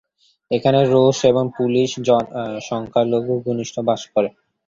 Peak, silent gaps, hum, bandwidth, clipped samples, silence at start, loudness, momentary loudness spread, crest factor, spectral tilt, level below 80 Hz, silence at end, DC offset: -2 dBFS; none; none; 7.6 kHz; under 0.1%; 0.5 s; -19 LUFS; 10 LU; 18 dB; -6 dB/octave; -58 dBFS; 0.4 s; under 0.1%